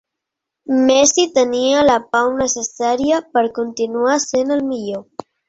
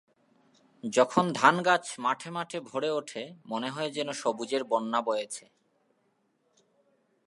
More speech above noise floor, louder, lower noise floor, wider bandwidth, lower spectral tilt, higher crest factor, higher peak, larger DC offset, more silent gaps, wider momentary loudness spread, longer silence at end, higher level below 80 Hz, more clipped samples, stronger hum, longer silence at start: first, 65 dB vs 44 dB; first, -16 LUFS vs -29 LUFS; first, -81 dBFS vs -73 dBFS; second, 8 kHz vs 11.5 kHz; second, -2.5 dB/octave vs -4 dB/octave; second, 16 dB vs 26 dB; first, -2 dBFS vs -6 dBFS; neither; neither; second, 11 LU vs 14 LU; second, 0.45 s vs 1.85 s; first, -52 dBFS vs -82 dBFS; neither; neither; second, 0.7 s vs 0.85 s